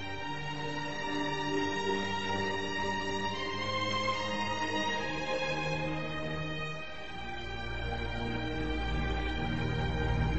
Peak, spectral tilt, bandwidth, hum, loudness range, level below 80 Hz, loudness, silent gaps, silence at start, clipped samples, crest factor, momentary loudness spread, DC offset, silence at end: -18 dBFS; -5 dB/octave; 8.2 kHz; none; 4 LU; -44 dBFS; -34 LUFS; none; 0 s; under 0.1%; 14 dB; 6 LU; 0.7%; 0 s